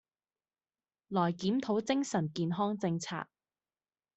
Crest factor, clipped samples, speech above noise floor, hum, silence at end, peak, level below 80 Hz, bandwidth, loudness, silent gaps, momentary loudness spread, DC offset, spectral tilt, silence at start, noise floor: 18 dB; under 0.1%; over 58 dB; none; 0.9 s; -16 dBFS; -74 dBFS; 8.2 kHz; -33 LUFS; none; 7 LU; under 0.1%; -6 dB/octave; 1.1 s; under -90 dBFS